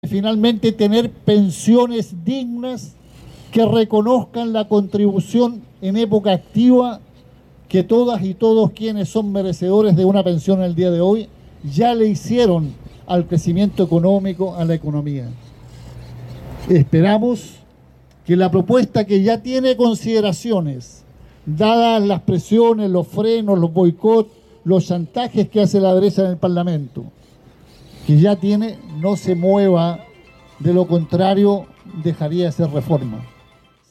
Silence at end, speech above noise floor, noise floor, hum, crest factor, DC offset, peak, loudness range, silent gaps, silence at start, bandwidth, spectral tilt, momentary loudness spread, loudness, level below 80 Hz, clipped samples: 0.65 s; 36 dB; -51 dBFS; none; 14 dB; under 0.1%; -4 dBFS; 3 LU; none; 0.05 s; 14 kHz; -7.5 dB/octave; 12 LU; -17 LUFS; -48 dBFS; under 0.1%